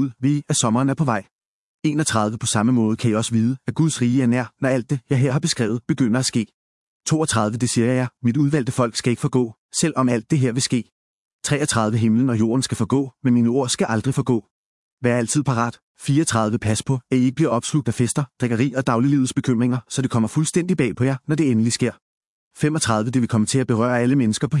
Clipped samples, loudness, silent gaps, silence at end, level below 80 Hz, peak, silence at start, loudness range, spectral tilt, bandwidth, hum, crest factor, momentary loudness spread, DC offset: under 0.1%; -20 LUFS; 1.31-1.39 s, 1.45-1.79 s, 6.54-7.00 s, 9.58-9.69 s, 10.92-11.39 s, 14.51-14.97 s, 15.82-15.95 s, 22.02-22.51 s; 0 s; -58 dBFS; -4 dBFS; 0 s; 1 LU; -5.5 dB/octave; 12 kHz; none; 16 dB; 5 LU; under 0.1%